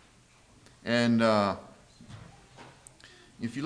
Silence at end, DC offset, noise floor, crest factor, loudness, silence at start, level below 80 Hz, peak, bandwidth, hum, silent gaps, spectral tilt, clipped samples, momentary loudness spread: 0 s; under 0.1%; -60 dBFS; 20 dB; -27 LUFS; 0.85 s; -64 dBFS; -12 dBFS; 10.5 kHz; none; none; -6 dB/octave; under 0.1%; 26 LU